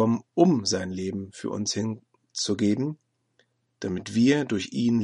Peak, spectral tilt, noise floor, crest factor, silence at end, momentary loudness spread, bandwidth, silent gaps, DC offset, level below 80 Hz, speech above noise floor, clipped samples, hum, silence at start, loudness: -6 dBFS; -5 dB/octave; -69 dBFS; 20 dB; 0 s; 12 LU; 10.5 kHz; none; under 0.1%; -66 dBFS; 44 dB; under 0.1%; none; 0 s; -26 LUFS